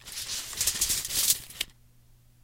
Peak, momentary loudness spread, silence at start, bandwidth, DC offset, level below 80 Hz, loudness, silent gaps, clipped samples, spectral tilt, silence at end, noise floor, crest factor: -6 dBFS; 12 LU; 0 s; 17 kHz; under 0.1%; -52 dBFS; -27 LUFS; none; under 0.1%; 1 dB/octave; 0.7 s; -58 dBFS; 26 dB